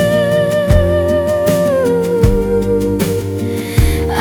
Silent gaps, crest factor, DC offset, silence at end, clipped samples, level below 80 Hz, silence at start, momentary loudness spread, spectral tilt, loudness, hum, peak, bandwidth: none; 12 dB; under 0.1%; 0 s; under 0.1%; -22 dBFS; 0 s; 4 LU; -6.5 dB/octave; -14 LUFS; none; 0 dBFS; over 20 kHz